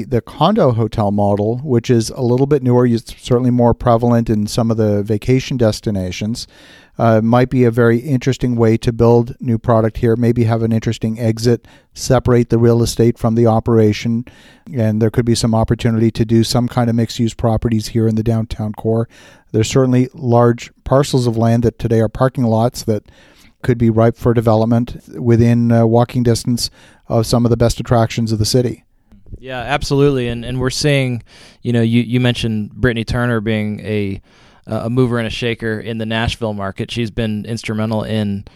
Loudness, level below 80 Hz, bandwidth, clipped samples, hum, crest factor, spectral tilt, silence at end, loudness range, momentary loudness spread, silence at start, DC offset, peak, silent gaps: -16 LUFS; -36 dBFS; 13.5 kHz; under 0.1%; none; 14 dB; -6.5 dB/octave; 0.15 s; 4 LU; 9 LU; 0 s; under 0.1%; 0 dBFS; none